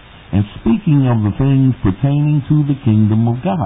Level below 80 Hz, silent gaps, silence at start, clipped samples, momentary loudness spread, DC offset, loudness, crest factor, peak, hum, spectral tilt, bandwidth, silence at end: -36 dBFS; none; 0.3 s; under 0.1%; 4 LU; under 0.1%; -15 LUFS; 12 dB; -2 dBFS; none; -14 dB/octave; 3.9 kHz; 0 s